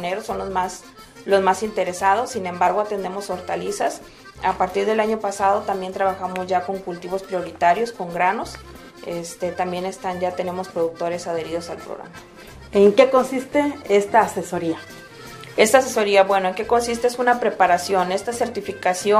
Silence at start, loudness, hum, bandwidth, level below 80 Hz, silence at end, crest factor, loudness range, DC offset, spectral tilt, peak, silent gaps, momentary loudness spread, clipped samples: 0 s; -21 LUFS; none; 15.5 kHz; -52 dBFS; 0 s; 20 dB; 7 LU; under 0.1%; -4 dB/octave; 0 dBFS; none; 15 LU; under 0.1%